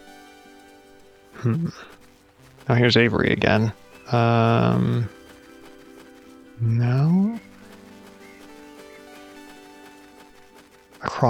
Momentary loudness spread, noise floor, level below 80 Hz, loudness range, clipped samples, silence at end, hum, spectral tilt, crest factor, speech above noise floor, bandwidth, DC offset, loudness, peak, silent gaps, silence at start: 26 LU; -52 dBFS; -54 dBFS; 6 LU; under 0.1%; 0 s; none; -7 dB/octave; 20 dB; 32 dB; 9 kHz; under 0.1%; -21 LUFS; -4 dBFS; none; 1.35 s